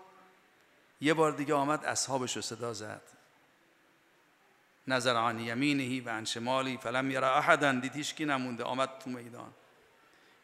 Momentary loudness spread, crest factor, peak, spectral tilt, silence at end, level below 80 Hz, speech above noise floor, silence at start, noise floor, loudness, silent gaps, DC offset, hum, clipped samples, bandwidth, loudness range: 15 LU; 26 dB; -8 dBFS; -3.5 dB/octave; 0.9 s; -80 dBFS; 35 dB; 0 s; -66 dBFS; -31 LUFS; none; under 0.1%; none; under 0.1%; 15.5 kHz; 6 LU